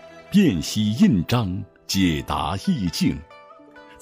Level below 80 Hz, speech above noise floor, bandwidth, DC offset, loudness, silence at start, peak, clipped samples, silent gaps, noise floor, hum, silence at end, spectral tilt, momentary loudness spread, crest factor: -44 dBFS; 25 dB; 16 kHz; under 0.1%; -22 LUFS; 0.05 s; -6 dBFS; under 0.1%; none; -46 dBFS; none; 0.2 s; -5.5 dB/octave; 8 LU; 16 dB